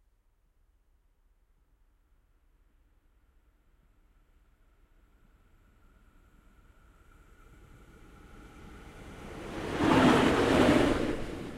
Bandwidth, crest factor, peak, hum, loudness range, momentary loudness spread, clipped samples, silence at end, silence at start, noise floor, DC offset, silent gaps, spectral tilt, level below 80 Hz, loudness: 15.5 kHz; 24 dB; -10 dBFS; none; 25 LU; 27 LU; under 0.1%; 0 s; 8.35 s; -69 dBFS; under 0.1%; none; -5.5 dB/octave; -50 dBFS; -26 LUFS